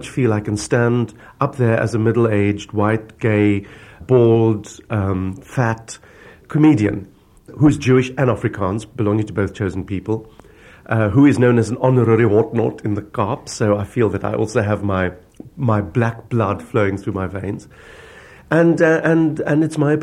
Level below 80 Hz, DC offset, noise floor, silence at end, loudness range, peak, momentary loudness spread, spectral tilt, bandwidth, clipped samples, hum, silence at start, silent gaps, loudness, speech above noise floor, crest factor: -48 dBFS; under 0.1%; -44 dBFS; 0 s; 4 LU; 0 dBFS; 11 LU; -7.5 dB/octave; 11.5 kHz; under 0.1%; none; 0 s; none; -18 LUFS; 27 dB; 16 dB